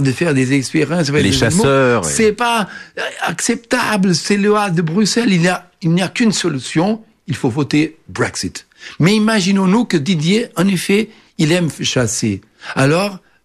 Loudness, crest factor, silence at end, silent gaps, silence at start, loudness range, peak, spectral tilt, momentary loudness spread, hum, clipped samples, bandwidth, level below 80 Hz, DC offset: -15 LUFS; 14 dB; 0.25 s; none; 0 s; 2 LU; -2 dBFS; -5 dB/octave; 8 LU; none; under 0.1%; 14 kHz; -46 dBFS; under 0.1%